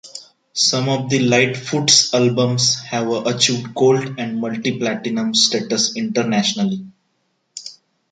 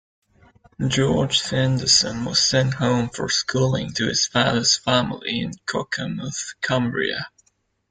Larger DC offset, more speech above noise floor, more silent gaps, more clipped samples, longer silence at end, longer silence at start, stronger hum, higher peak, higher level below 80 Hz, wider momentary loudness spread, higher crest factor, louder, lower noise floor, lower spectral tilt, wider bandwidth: neither; first, 50 dB vs 45 dB; neither; neither; second, 0.4 s vs 0.6 s; second, 0.05 s vs 0.8 s; neither; first, 0 dBFS vs -4 dBFS; second, -62 dBFS vs -50 dBFS; first, 15 LU vs 10 LU; about the same, 18 dB vs 18 dB; first, -17 LUFS vs -21 LUFS; about the same, -68 dBFS vs -67 dBFS; about the same, -3.5 dB/octave vs -3.5 dB/octave; first, 11 kHz vs 9.6 kHz